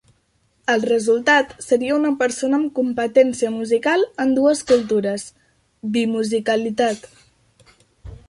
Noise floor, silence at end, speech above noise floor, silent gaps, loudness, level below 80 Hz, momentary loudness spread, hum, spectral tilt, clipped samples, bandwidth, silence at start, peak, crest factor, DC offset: -64 dBFS; 0.1 s; 45 dB; none; -19 LUFS; -54 dBFS; 7 LU; none; -4 dB/octave; under 0.1%; 11.5 kHz; 0.7 s; -2 dBFS; 16 dB; under 0.1%